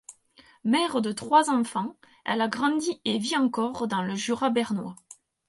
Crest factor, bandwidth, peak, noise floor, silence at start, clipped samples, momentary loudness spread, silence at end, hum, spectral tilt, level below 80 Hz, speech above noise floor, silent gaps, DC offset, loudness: 20 dB; 11.5 kHz; -6 dBFS; -58 dBFS; 0.1 s; under 0.1%; 11 LU; 0.35 s; none; -4 dB/octave; -70 dBFS; 32 dB; none; under 0.1%; -26 LUFS